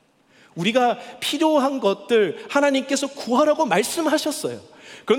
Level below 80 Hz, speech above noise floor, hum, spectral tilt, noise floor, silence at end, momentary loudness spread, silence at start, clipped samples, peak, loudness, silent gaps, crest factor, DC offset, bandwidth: -72 dBFS; 35 dB; none; -3.5 dB/octave; -55 dBFS; 0 s; 9 LU; 0.55 s; under 0.1%; -6 dBFS; -21 LUFS; none; 16 dB; under 0.1%; 18 kHz